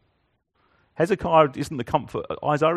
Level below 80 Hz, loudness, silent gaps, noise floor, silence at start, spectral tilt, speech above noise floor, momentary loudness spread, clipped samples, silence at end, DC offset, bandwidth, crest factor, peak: -52 dBFS; -23 LUFS; none; -70 dBFS; 1 s; -6.5 dB/octave; 48 dB; 10 LU; under 0.1%; 0 s; under 0.1%; 13 kHz; 20 dB; -4 dBFS